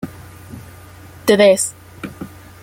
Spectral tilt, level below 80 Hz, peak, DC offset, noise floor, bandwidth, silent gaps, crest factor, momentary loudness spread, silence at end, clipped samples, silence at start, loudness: -3.5 dB/octave; -52 dBFS; -2 dBFS; under 0.1%; -39 dBFS; 17 kHz; none; 18 dB; 25 LU; 0.35 s; under 0.1%; 0.05 s; -14 LUFS